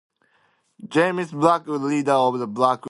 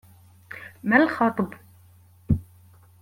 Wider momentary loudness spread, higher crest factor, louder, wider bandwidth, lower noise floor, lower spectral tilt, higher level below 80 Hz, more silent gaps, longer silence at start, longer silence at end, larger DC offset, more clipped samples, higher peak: second, 4 LU vs 21 LU; about the same, 20 dB vs 20 dB; about the same, -21 LUFS vs -23 LUFS; second, 11.5 kHz vs 16.5 kHz; first, -64 dBFS vs -54 dBFS; second, -6 dB/octave vs -8 dB/octave; second, -68 dBFS vs -46 dBFS; neither; first, 0.8 s vs 0.5 s; second, 0 s vs 0.6 s; neither; neither; first, -2 dBFS vs -6 dBFS